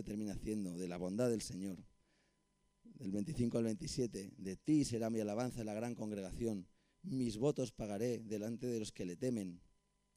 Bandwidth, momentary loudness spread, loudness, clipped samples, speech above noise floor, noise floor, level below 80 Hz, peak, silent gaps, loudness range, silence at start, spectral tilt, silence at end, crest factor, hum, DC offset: 15.5 kHz; 10 LU; -41 LUFS; under 0.1%; 39 dB; -79 dBFS; -62 dBFS; -24 dBFS; none; 4 LU; 0 s; -6 dB/octave; 0.6 s; 18 dB; none; under 0.1%